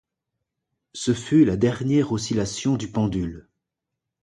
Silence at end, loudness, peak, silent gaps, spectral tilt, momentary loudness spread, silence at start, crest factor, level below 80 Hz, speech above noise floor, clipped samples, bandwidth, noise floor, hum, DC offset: 0.8 s; -23 LUFS; -6 dBFS; none; -6 dB/octave; 11 LU; 0.95 s; 18 dB; -48 dBFS; 62 dB; under 0.1%; 11.5 kHz; -84 dBFS; none; under 0.1%